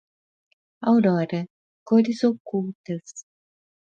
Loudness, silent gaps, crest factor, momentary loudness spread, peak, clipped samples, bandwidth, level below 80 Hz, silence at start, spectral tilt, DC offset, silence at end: -23 LUFS; 1.50-1.86 s, 2.40-2.45 s, 2.75-2.84 s; 18 dB; 17 LU; -8 dBFS; under 0.1%; 7.6 kHz; -72 dBFS; 0.8 s; -7 dB/octave; under 0.1%; 0.65 s